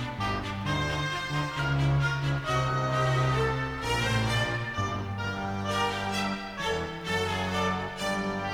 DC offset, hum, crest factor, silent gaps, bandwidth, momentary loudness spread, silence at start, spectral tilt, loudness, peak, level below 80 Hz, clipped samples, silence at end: under 0.1%; none; 14 dB; none; 16 kHz; 6 LU; 0 s; -5 dB/octave; -29 LUFS; -16 dBFS; -44 dBFS; under 0.1%; 0 s